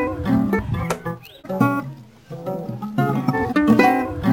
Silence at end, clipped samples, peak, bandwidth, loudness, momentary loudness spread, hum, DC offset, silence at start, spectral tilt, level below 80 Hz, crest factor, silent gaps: 0 s; under 0.1%; -2 dBFS; 17 kHz; -20 LUFS; 17 LU; none; under 0.1%; 0 s; -7.5 dB/octave; -42 dBFS; 18 dB; none